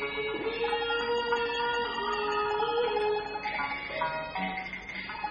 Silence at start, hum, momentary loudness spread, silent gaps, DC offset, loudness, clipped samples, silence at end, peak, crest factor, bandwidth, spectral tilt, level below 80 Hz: 0 s; none; 5 LU; none; under 0.1%; -31 LUFS; under 0.1%; 0 s; -16 dBFS; 14 dB; 9 kHz; -4 dB/octave; -56 dBFS